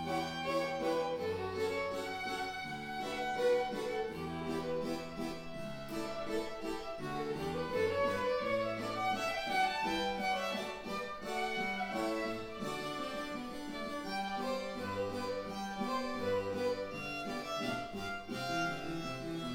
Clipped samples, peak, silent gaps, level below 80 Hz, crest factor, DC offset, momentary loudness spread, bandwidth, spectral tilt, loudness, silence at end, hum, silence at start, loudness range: under 0.1%; -20 dBFS; none; -60 dBFS; 16 dB; under 0.1%; 7 LU; 17 kHz; -4.5 dB/octave; -37 LUFS; 0 s; none; 0 s; 5 LU